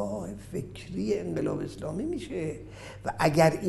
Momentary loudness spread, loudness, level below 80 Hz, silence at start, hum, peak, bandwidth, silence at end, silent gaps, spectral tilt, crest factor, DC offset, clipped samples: 13 LU; -31 LUFS; -52 dBFS; 0 s; none; -8 dBFS; 12.5 kHz; 0 s; none; -6 dB/octave; 22 dB; under 0.1%; under 0.1%